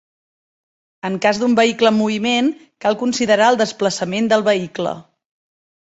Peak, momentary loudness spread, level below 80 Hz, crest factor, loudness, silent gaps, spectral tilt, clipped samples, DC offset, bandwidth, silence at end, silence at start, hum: -2 dBFS; 11 LU; -62 dBFS; 16 dB; -17 LUFS; none; -4 dB/octave; under 0.1%; under 0.1%; 8.2 kHz; 0.95 s; 1.05 s; none